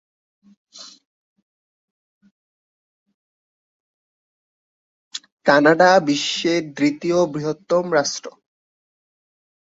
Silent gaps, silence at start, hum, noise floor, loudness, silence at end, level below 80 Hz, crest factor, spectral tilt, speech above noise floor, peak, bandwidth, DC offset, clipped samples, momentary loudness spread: 1.05-1.36 s, 1.42-2.21 s, 2.31-3.06 s, 3.14-5.11 s, 5.32-5.37 s; 0.75 s; none; under -90 dBFS; -18 LUFS; 1.35 s; -66 dBFS; 22 dB; -4 dB/octave; over 72 dB; -2 dBFS; 8 kHz; under 0.1%; under 0.1%; 21 LU